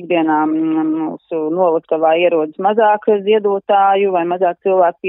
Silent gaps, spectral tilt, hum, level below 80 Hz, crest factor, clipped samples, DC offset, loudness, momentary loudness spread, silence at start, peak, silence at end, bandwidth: none; -10.5 dB/octave; none; -74 dBFS; 14 dB; under 0.1%; under 0.1%; -15 LUFS; 5 LU; 0 s; -2 dBFS; 0 s; 3.8 kHz